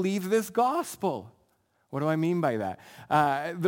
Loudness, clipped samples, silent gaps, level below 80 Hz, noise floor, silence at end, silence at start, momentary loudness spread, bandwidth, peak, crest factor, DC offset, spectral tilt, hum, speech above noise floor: -28 LUFS; under 0.1%; none; -72 dBFS; -70 dBFS; 0 s; 0 s; 11 LU; 17 kHz; -10 dBFS; 18 dB; under 0.1%; -6 dB/octave; none; 43 dB